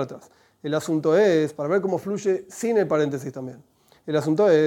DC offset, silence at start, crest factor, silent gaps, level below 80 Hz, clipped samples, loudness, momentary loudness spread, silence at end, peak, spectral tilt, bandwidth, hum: under 0.1%; 0 s; 16 dB; none; -70 dBFS; under 0.1%; -23 LUFS; 18 LU; 0 s; -6 dBFS; -6 dB/octave; 16.5 kHz; none